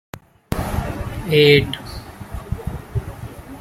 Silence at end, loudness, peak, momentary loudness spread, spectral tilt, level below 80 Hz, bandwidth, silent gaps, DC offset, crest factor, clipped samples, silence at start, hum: 0 s; -20 LUFS; 0 dBFS; 22 LU; -6 dB/octave; -34 dBFS; 16 kHz; none; under 0.1%; 20 dB; under 0.1%; 0.15 s; none